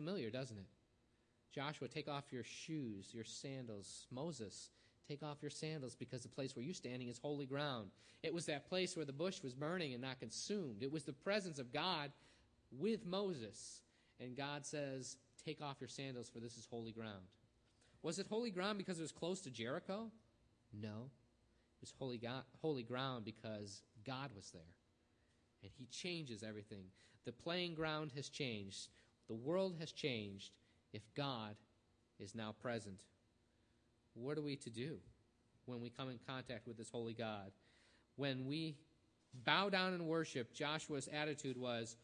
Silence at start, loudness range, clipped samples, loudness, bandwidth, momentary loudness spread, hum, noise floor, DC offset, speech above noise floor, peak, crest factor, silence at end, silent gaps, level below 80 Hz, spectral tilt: 0 s; 8 LU; under 0.1%; -46 LUFS; 10 kHz; 14 LU; none; -78 dBFS; under 0.1%; 32 dB; -20 dBFS; 28 dB; 0 s; none; -82 dBFS; -4.5 dB/octave